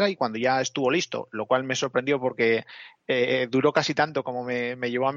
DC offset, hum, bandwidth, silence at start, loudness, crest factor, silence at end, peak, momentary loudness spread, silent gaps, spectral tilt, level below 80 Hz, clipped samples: under 0.1%; none; 7.6 kHz; 0 s; -25 LUFS; 18 dB; 0 s; -6 dBFS; 7 LU; none; -4.5 dB/octave; -70 dBFS; under 0.1%